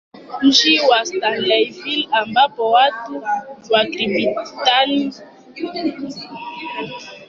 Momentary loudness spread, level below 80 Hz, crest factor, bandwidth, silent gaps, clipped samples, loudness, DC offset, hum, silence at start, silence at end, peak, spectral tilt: 17 LU; -64 dBFS; 16 dB; 7.4 kHz; none; under 0.1%; -17 LUFS; under 0.1%; none; 0.15 s; 0.05 s; -2 dBFS; -2.5 dB/octave